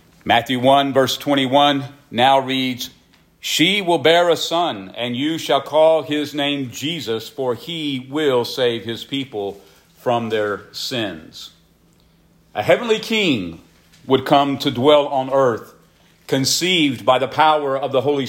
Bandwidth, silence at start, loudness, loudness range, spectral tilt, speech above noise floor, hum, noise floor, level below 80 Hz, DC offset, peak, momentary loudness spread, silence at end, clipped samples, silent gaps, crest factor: 16.5 kHz; 0.25 s; -18 LUFS; 6 LU; -4 dB/octave; 37 dB; none; -55 dBFS; -60 dBFS; under 0.1%; -2 dBFS; 11 LU; 0 s; under 0.1%; none; 16 dB